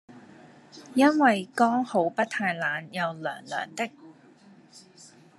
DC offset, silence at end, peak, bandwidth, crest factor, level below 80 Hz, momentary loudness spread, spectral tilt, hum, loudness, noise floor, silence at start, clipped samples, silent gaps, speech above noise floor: under 0.1%; 0.6 s; -8 dBFS; 12.5 kHz; 20 dB; -80 dBFS; 12 LU; -5 dB/octave; none; -26 LUFS; -54 dBFS; 0.1 s; under 0.1%; none; 29 dB